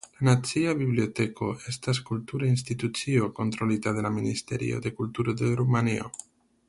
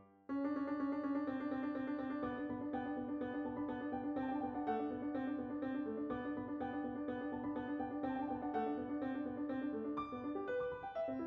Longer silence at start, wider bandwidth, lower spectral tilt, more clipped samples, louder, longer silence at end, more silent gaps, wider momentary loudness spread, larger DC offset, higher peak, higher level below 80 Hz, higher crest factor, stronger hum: about the same, 0.05 s vs 0 s; first, 11.5 kHz vs 4.9 kHz; about the same, -6 dB/octave vs -5.5 dB/octave; neither; first, -28 LUFS vs -42 LUFS; first, 0.55 s vs 0 s; neither; first, 8 LU vs 3 LU; neither; first, -10 dBFS vs -28 dBFS; first, -58 dBFS vs -70 dBFS; about the same, 18 dB vs 14 dB; neither